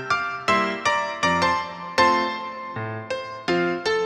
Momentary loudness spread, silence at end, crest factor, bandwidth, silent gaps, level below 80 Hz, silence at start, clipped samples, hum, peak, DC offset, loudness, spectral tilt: 12 LU; 0 s; 18 dB; 13 kHz; none; -56 dBFS; 0 s; under 0.1%; none; -4 dBFS; under 0.1%; -23 LUFS; -4 dB/octave